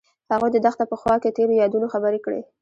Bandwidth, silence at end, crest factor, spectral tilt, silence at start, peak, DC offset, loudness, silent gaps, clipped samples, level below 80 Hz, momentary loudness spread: 7.6 kHz; 0.15 s; 16 dB; -7 dB/octave; 0.3 s; -6 dBFS; under 0.1%; -21 LUFS; none; under 0.1%; -56 dBFS; 7 LU